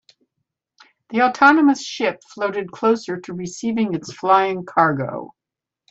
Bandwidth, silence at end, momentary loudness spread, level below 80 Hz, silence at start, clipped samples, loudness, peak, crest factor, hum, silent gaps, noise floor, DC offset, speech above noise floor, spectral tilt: 8 kHz; 0.65 s; 14 LU; -66 dBFS; 1.1 s; under 0.1%; -19 LUFS; 0 dBFS; 20 dB; none; none; -86 dBFS; under 0.1%; 67 dB; -5 dB/octave